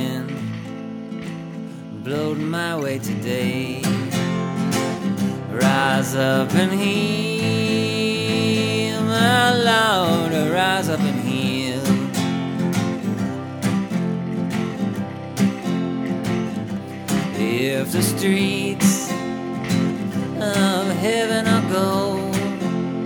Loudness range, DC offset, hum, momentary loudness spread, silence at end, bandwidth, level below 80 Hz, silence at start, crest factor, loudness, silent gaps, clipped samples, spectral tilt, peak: 6 LU; under 0.1%; none; 9 LU; 0 s; 19 kHz; -58 dBFS; 0 s; 18 dB; -21 LUFS; none; under 0.1%; -5 dB/octave; -2 dBFS